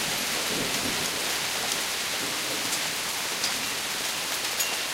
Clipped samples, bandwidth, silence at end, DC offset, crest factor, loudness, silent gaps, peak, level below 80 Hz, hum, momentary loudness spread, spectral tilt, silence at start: under 0.1%; 16 kHz; 0 s; under 0.1%; 20 dB; -26 LUFS; none; -8 dBFS; -60 dBFS; none; 2 LU; -0.5 dB/octave; 0 s